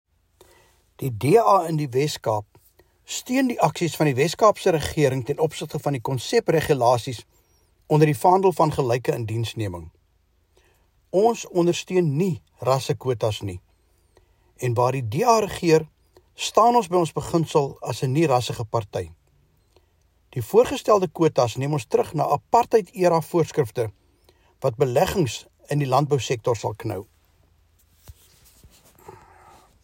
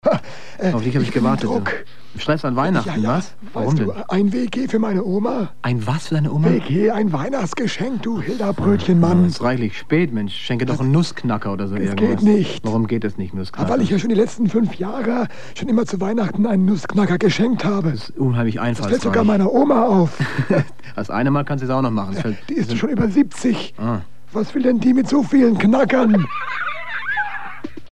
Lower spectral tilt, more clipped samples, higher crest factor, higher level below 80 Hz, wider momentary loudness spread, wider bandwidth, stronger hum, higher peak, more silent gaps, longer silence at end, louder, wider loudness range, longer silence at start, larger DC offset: about the same, -6 dB/octave vs -7 dB/octave; neither; about the same, 18 dB vs 16 dB; about the same, -54 dBFS vs -52 dBFS; first, 12 LU vs 9 LU; first, 16.5 kHz vs 10 kHz; neither; about the same, -4 dBFS vs -4 dBFS; neither; first, 0.75 s vs 0 s; second, -22 LUFS vs -19 LUFS; about the same, 4 LU vs 3 LU; first, 1 s vs 0 s; second, under 0.1% vs 4%